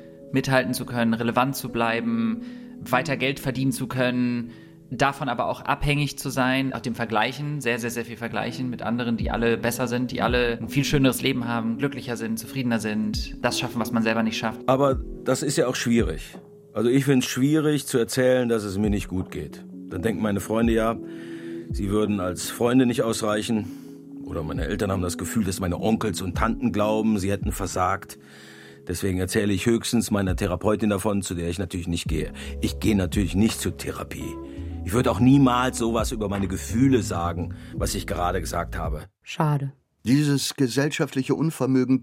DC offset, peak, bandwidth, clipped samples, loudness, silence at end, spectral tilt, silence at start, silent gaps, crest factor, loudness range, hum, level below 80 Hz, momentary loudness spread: under 0.1%; -4 dBFS; 16 kHz; under 0.1%; -24 LUFS; 0 s; -5.5 dB/octave; 0 s; none; 20 dB; 3 LU; none; -40 dBFS; 12 LU